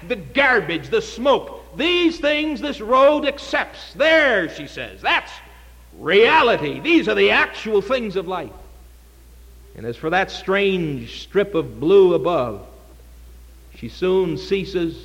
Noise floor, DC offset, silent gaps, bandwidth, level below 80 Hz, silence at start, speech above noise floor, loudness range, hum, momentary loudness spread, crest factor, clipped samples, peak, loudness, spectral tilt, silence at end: -45 dBFS; under 0.1%; none; 16 kHz; -44 dBFS; 0 s; 27 dB; 6 LU; none; 15 LU; 16 dB; under 0.1%; -4 dBFS; -18 LUFS; -5 dB/octave; 0 s